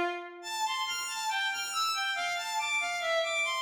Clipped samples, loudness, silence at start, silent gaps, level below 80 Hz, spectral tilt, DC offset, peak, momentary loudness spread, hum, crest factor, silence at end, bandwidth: under 0.1%; -31 LUFS; 0 s; none; -76 dBFS; 1 dB/octave; under 0.1%; -20 dBFS; 5 LU; none; 12 dB; 0 s; 19 kHz